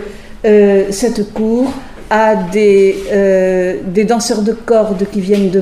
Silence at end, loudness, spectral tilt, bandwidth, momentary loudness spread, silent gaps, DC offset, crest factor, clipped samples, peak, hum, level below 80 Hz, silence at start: 0 s; -12 LUFS; -5.5 dB/octave; 14 kHz; 8 LU; none; under 0.1%; 12 dB; under 0.1%; 0 dBFS; none; -38 dBFS; 0 s